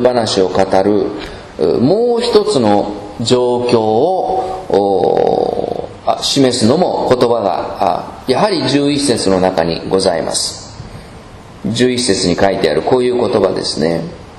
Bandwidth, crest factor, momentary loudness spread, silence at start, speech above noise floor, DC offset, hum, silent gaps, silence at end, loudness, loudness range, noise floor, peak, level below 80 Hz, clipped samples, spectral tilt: 13.5 kHz; 14 dB; 9 LU; 0 s; 21 dB; under 0.1%; none; none; 0 s; -14 LUFS; 2 LU; -34 dBFS; 0 dBFS; -42 dBFS; 0.2%; -4.5 dB/octave